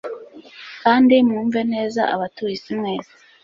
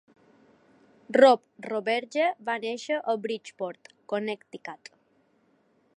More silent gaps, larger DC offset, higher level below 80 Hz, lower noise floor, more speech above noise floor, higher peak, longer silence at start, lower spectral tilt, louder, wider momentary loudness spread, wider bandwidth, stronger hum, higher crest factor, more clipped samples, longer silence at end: neither; neither; first, -64 dBFS vs -86 dBFS; second, -40 dBFS vs -67 dBFS; second, 22 dB vs 40 dB; about the same, -2 dBFS vs -4 dBFS; second, 0.05 s vs 1.1 s; first, -6 dB/octave vs -4 dB/octave; first, -19 LUFS vs -27 LUFS; about the same, 20 LU vs 21 LU; second, 7.4 kHz vs 10.5 kHz; neither; second, 18 dB vs 24 dB; neither; second, 0.4 s vs 1.2 s